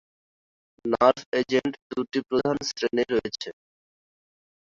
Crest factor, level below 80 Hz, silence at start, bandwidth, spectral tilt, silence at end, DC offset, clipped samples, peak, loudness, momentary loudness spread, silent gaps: 22 dB; -62 dBFS; 0.85 s; 7.6 kHz; -4.5 dB/octave; 1.15 s; under 0.1%; under 0.1%; -4 dBFS; -26 LUFS; 13 LU; 1.26-1.32 s, 1.82-1.90 s